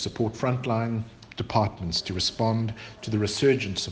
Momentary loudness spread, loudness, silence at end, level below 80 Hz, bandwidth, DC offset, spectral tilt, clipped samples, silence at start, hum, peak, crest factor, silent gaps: 10 LU; -27 LUFS; 0 s; -52 dBFS; 9.8 kHz; under 0.1%; -5 dB/octave; under 0.1%; 0 s; none; -6 dBFS; 20 dB; none